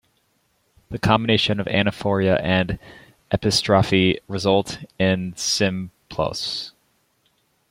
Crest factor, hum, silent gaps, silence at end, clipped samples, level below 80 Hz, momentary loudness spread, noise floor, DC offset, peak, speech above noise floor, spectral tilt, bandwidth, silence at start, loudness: 20 dB; none; none; 1 s; under 0.1%; -48 dBFS; 13 LU; -66 dBFS; under 0.1%; -2 dBFS; 46 dB; -4.5 dB/octave; 16 kHz; 0.9 s; -21 LUFS